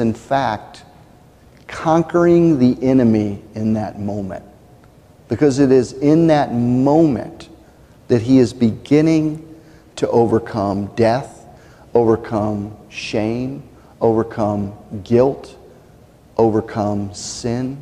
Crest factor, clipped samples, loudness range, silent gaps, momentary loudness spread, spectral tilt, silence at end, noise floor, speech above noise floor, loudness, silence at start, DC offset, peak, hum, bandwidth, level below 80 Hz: 16 dB; under 0.1%; 5 LU; none; 14 LU; -7.5 dB/octave; 0 s; -46 dBFS; 30 dB; -17 LUFS; 0 s; under 0.1%; -2 dBFS; none; 10.5 kHz; -48 dBFS